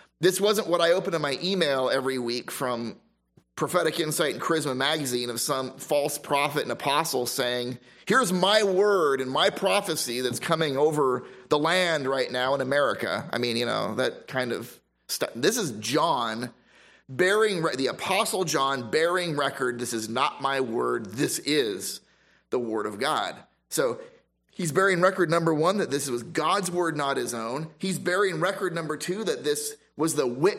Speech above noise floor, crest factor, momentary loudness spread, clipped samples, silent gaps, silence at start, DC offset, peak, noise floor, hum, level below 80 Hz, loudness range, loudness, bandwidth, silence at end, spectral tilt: 38 dB; 20 dB; 9 LU; under 0.1%; none; 0.2 s; under 0.1%; -6 dBFS; -63 dBFS; none; -72 dBFS; 4 LU; -26 LUFS; 16 kHz; 0 s; -3.5 dB/octave